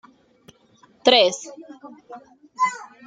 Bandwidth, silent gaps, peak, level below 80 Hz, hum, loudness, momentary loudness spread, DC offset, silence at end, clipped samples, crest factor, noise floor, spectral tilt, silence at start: 9.4 kHz; none; -2 dBFS; -70 dBFS; none; -19 LUFS; 27 LU; under 0.1%; 0.2 s; under 0.1%; 24 dB; -56 dBFS; -1.5 dB/octave; 1.05 s